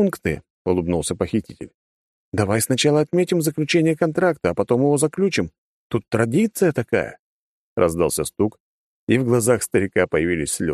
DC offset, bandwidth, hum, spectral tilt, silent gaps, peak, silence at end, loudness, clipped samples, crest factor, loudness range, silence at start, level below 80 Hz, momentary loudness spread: under 0.1%; 13 kHz; none; -5 dB/octave; 0.50-0.65 s, 1.74-2.32 s, 5.58-5.90 s, 7.19-7.76 s, 8.60-9.07 s; -4 dBFS; 0 s; -20 LUFS; under 0.1%; 18 dB; 3 LU; 0 s; -48 dBFS; 10 LU